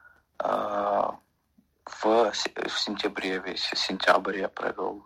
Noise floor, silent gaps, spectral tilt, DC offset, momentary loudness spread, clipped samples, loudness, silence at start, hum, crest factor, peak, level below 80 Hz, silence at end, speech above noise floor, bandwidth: -67 dBFS; none; -3 dB/octave; under 0.1%; 8 LU; under 0.1%; -27 LUFS; 0.05 s; none; 22 dB; -6 dBFS; -66 dBFS; 0.05 s; 38 dB; 15.5 kHz